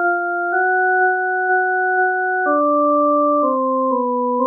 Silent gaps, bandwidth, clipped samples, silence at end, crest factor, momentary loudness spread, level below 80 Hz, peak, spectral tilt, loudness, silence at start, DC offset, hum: none; 1.7 kHz; under 0.1%; 0 s; 10 dB; 3 LU; -86 dBFS; -8 dBFS; -10.5 dB/octave; -17 LUFS; 0 s; under 0.1%; none